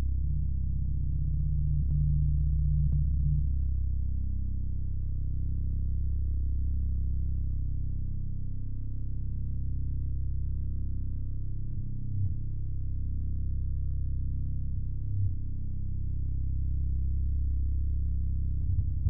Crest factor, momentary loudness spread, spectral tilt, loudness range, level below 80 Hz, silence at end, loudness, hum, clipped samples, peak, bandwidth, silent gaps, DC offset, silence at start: 14 dB; 8 LU; -16.5 dB/octave; 6 LU; -32 dBFS; 0 s; -33 LUFS; none; under 0.1%; -16 dBFS; 0.6 kHz; none; 2%; 0 s